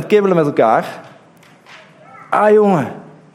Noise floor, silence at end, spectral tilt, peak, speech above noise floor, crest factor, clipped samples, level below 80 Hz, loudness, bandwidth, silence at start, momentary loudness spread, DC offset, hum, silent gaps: -46 dBFS; 0.35 s; -7.5 dB/octave; 0 dBFS; 33 dB; 16 dB; under 0.1%; -66 dBFS; -13 LUFS; 12.5 kHz; 0 s; 19 LU; under 0.1%; none; none